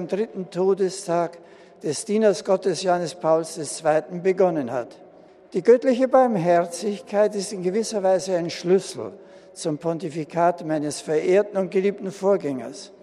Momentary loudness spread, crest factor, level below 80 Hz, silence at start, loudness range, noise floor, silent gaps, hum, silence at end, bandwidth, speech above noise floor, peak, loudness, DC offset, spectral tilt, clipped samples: 11 LU; 18 dB; -72 dBFS; 0 s; 3 LU; -49 dBFS; none; none; 0.15 s; 12.5 kHz; 27 dB; -4 dBFS; -23 LUFS; under 0.1%; -5.5 dB/octave; under 0.1%